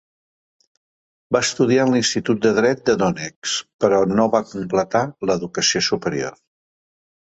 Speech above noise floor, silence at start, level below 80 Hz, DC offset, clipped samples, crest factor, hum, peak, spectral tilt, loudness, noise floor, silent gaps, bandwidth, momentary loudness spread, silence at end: over 71 dB; 1.3 s; -56 dBFS; under 0.1%; under 0.1%; 18 dB; none; -2 dBFS; -4 dB/octave; -19 LUFS; under -90 dBFS; 3.36-3.42 s, 3.74-3.79 s; 8.2 kHz; 7 LU; 0.9 s